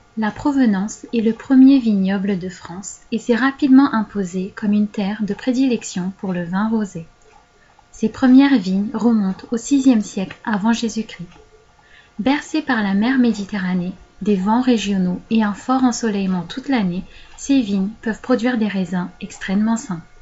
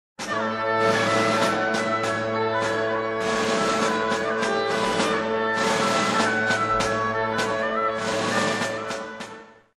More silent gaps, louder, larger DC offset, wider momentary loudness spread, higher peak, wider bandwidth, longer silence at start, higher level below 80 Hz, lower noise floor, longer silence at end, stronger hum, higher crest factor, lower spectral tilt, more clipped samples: neither; first, -18 LUFS vs -23 LUFS; neither; first, 13 LU vs 5 LU; first, -2 dBFS vs -8 dBFS; second, 8 kHz vs 13 kHz; about the same, 0.15 s vs 0.2 s; about the same, -50 dBFS vs -54 dBFS; first, -52 dBFS vs -43 dBFS; about the same, 0.2 s vs 0.25 s; neither; about the same, 16 dB vs 16 dB; first, -6 dB/octave vs -3.5 dB/octave; neither